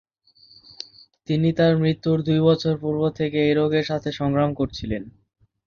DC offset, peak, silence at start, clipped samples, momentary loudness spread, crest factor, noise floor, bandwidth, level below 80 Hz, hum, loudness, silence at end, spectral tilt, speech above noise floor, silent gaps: under 0.1%; -6 dBFS; 1.3 s; under 0.1%; 17 LU; 16 dB; -55 dBFS; 6.8 kHz; -50 dBFS; none; -22 LUFS; 0.6 s; -8 dB/octave; 34 dB; none